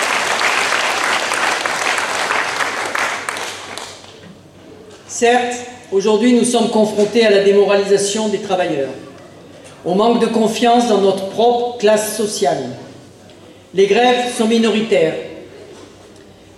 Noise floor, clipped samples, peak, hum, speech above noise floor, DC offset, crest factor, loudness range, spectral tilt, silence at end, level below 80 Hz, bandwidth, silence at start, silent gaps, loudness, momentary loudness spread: -41 dBFS; under 0.1%; -2 dBFS; none; 27 dB; under 0.1%; 14 dB; 6 LU; -3.5 dB/octave; 0.7 s; -62 dBFS; 14.5 kHz; 0 s; none; -15 LUFS; 14 LU